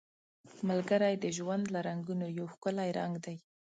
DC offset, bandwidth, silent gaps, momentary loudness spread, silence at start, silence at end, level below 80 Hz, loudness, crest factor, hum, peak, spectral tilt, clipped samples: under 0.1%; 9.2 kHz; none; 10 LU; 0.45 s; 0.4 s; -78 dBFS; -35 LUFS; 18 dB; none; -16 dBFS; -6 dB/octave; under 0.1%